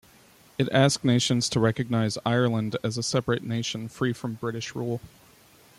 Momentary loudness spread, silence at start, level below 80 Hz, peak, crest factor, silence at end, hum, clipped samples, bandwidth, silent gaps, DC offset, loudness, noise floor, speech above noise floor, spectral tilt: 10 LU; 0.6 s; -60 dBFS; -8 dBFS; 18 dB; 0.7 s; none; under 0.1%; 15 kHz; none; under 0.1%; -26 LUFS; -55 dBFS; 30 dB; -5 dB/octave